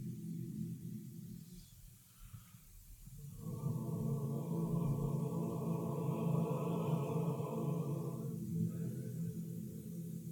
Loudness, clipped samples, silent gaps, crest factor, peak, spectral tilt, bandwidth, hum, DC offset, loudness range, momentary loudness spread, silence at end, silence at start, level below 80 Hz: -40 LUFS; under 0.1%; none; 16 dB; -24 dBFS; -8.5 dB/octave; 19 kHz; none; under 0.1%; 11 LU; 19 LU; 0 s; 0 s; -62 dBFS